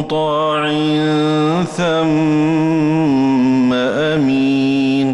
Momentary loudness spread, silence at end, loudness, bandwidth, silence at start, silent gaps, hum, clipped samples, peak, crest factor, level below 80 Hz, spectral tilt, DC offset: 2 LU; 0 s; -15 LUFS; 11 kHz; 0 s; none; none; under 0.1%; -8 dBFS; 8 dB; -50 dBFS; -6.5 dB/octave; under 0.1%